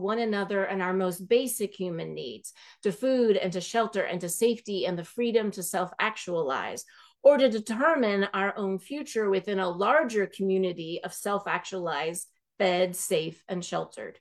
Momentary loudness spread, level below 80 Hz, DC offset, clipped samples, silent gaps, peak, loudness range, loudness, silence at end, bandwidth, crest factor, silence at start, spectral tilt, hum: 11 LU; -78 dBFS; under 0.1%; under 0.1%; none; -8 dBFS; 3 LU; -28 LUFS; 0.1 s; 13 kHz; 20 dB; 0 s; -4 dB/octave; none